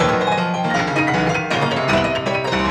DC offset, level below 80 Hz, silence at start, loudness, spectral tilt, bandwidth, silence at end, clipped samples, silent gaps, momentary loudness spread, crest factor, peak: under 0.1%; -42 dBFS; 0 s; -18 LUFS; -5 dB/octave; 13 kHz; 0 s; under 0.1%; none; 2 LU; 14 dB; -4 dBFS